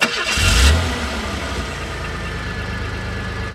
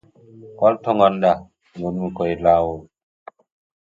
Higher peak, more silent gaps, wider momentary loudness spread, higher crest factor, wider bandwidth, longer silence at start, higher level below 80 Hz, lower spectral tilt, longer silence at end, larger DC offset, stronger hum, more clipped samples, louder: about the same, -2 dBFS vs 0 dBFS; neither; about the same, 12 LU vs 11 LU; about the same, 18 dB vs 20 dB; first, 15.5 kHz vs 7.4 kHz; second, 0 s vs 0.35 s; first, -24 dBFS vs -48 dBFS; second, -3.5 dB/octave vs -8.5 dB/octave; second, 0 s vs 1 s; neither; neither; neither; about the same, -20 LUFS vs -19 LUFS